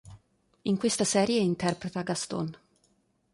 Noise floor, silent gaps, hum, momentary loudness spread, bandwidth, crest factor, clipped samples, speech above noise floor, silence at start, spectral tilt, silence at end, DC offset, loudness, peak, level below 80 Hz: -70 dBFS; none; none; 10 LU; 11.5 kHz; 20 dB; under 0.1%; 42 dB; 0.05 s; -4.5 dB/octave; 0.8 s; under 0.1%; -29 LUFS; -10 dBFS; -64 dBFS